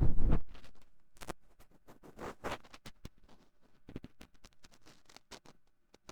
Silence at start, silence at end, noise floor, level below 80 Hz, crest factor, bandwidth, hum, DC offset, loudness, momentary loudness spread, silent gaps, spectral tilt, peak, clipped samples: 0 s; 0.75 s; -65 dBFS; -40 dBFS; 20 dB; 8.2 kHz; none; under 0.1%; -43 LUFS; 25 LU; none; -6.5 dB/octave; -14 dBFS; under 0.1%